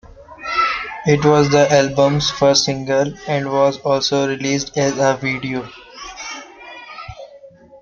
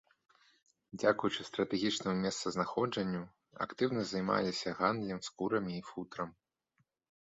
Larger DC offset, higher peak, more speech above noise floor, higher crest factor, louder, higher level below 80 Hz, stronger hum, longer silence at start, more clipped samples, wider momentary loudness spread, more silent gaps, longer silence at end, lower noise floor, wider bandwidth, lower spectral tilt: neither; first, -2 dBFS vs -14 dBFS; second, 27 dB vs 44 dB; second, 16 dB vs 22 dB; first, -16 LUFS vs -35 LUFS; first, -48 dBFS vs -70 dBFS; neither; second, 0.2 s vs 0.95 s; neither; first, 20 LU vs 10 LU; neither; second, 0.05 s vs 0.95 s; second, -43 dBFS vs -79 dBFS; about the same, 7.6 kHz vs 8 kHz; about the same, -4.5 dB/octave vs -4 dB/octave